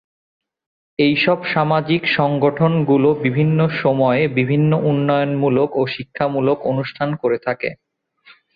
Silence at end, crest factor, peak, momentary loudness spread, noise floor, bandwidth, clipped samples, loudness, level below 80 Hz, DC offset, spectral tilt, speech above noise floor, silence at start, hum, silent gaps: 0.8 s; 16 dB; -2 dBFS; 7 LU; -51 dBFS; 5 kHz; under 0.1%; -17 LUFS; -56 dBFS; under 0.1%; -10 dB/octave; 34 dB; 1 s; none; none